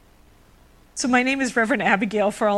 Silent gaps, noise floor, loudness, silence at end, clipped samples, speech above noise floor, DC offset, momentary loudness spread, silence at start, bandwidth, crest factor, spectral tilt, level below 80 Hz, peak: none; -53 dBFS; -21 LUFS; 0 s; under 0.1%; 32 dB; under 0.1%; 6 LU; 0.95 s; 13 kHz; 20 dB; -4 dB/octave; -56 dBFS; -2 dBFS